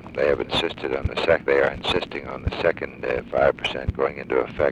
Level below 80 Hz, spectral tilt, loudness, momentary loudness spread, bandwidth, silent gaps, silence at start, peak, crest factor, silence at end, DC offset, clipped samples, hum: -40 dBFS; -5.5 dB/octave; -23 LUFS; 7 LU; 11.5 kHz; none; 0 s; -6 dBFS; 18 dB; 0 s; under 0.1%; under 0.1%; none